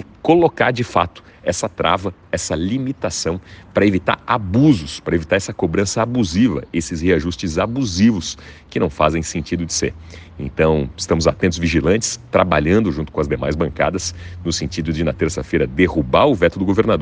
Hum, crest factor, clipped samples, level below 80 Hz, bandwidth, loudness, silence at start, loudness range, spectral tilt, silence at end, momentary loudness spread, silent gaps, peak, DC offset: none; 18 dB; under 0.1%; -38 dBFS; 10 kHz; -18 LUFS; 0 s; 3 LU; -5.5 dB/octave; 0 s; 9 LU; none; 0 dBFS; under 0.1%